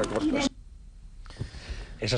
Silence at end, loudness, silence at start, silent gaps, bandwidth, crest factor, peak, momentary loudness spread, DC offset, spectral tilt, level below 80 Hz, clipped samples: 0 s; -31 LUFS; 0 s; none; 10 kHz; 18 dB; -14 dBFS; 24 LU; under 0.1%; -5 dB/octave; -42 dBFS; under 0.1%